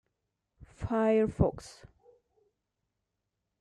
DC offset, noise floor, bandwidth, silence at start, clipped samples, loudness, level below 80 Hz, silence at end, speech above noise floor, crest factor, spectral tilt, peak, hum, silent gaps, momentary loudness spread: under 0.1%; -85 dBFS; 11 kHz; 0.6 s; under 0.1%; -29 LUFS; -50 dBFS; 1.75 s; 56 dB; 22 dB; -8 dB/octave; -12 dBFS; none; none; 21 LU